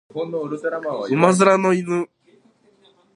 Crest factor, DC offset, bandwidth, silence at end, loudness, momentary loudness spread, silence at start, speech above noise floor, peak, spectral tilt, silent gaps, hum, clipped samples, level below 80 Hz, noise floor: 20 dB; under 0.1%; 11.5 kHz; 1.1 s; -19 LUFS; 12 LU; 0.15 s; 38 dB; 0 dBFS; -6 dB/octave; none; none; under 0.1%; -68 dBFS; -57 dBFS